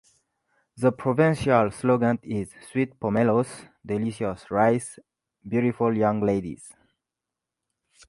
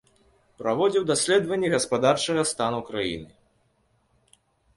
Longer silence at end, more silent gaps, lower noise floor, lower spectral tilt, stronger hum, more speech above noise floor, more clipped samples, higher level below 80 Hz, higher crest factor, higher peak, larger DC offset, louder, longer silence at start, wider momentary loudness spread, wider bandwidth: about the same, 1.4 s vs 1.5 s; neither; first, -87 dBFS vs -67 dBFS; first, -7 dB/octave vs -3.5 dB/octave; neither; first, 63 dB vs 44 dB; neither; about the same, -56 dBFS vs -60 dBFS; about the same, 20 dB vs 20 dB; about the same, -6 dBFS vs -6 dBFS; neither; about the same, -24 LUFS vs -24 LUFS; first, 0.75 s vs 0.6 s; about the same, 10 LU vs 8 LU; about the same, 11.5 kHz vs 11.5 kHz